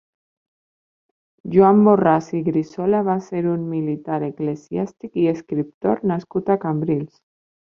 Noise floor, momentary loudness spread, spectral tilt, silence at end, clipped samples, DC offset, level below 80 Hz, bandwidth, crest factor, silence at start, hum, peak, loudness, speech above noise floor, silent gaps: under -90 dBFS; 12 LU; -9.5 dB/octave; 0.7 s; under 0.1%; under 0.1%; -60 dBFS; 7 kHz; 18 dB; 1.45 s; none; -2 dBFS; -20 LUFS; over 71 dB; 5.74-5.81 s